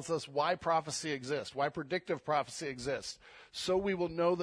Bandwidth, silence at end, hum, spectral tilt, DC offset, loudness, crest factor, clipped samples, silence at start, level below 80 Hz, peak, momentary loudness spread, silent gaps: 11 kHz; 0 s; none; -4 dB/octave; under 0.1%; -35 LUFS; 16 dB; under 0.1%; 0 s; -66 dBFS; -18 dBFS; 8 LU; none